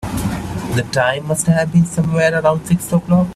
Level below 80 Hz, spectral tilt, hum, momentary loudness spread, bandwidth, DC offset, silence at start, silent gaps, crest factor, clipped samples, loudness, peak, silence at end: -40 dBFS; -6 dB/octave; none; 8 LU; 14.5 kHz; under 0.1%; 0 s; none; 14 dB; under 0.1%; -16 LUFS; 0 dBFS; 0 s